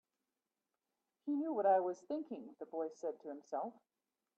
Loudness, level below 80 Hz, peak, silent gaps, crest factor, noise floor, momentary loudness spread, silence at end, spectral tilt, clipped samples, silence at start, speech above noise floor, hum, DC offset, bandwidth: -39 LUFS; under -90 dBFS; -22 dBFS; none; 20 dB; under -90 dBFS; 16 LU; 0.65 s; -6.5 dB/octave; under 0.1%; 1.25 s; over 51 dB; none; under 0.1%; 7.8 kHz